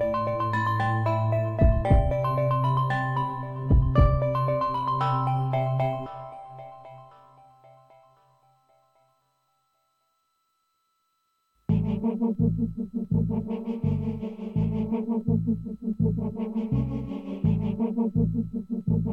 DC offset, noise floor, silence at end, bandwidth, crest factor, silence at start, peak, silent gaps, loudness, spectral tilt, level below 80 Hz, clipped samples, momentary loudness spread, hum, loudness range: under 0.1%; -74 dBFS; 0 s; 5.6 kHz; 18 dB; 0 s; -8 dBFS; none; -26 LUFS; -9.5 dB/octave; -36 dBFS; under 0.1%; 10 LU; none; 8 LU